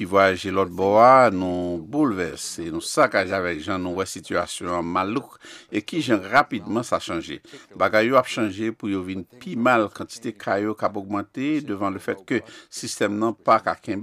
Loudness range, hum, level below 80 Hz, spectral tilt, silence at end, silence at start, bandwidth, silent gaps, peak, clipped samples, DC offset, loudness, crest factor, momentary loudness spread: 6 LU; none; -60 dBFS; -5 dB/octave; 0 s; 0 s; 15 kHz; none; -2 dBFS; under 0.1%; under 0.1%; -22 LUFS; 20 dB; 12 LU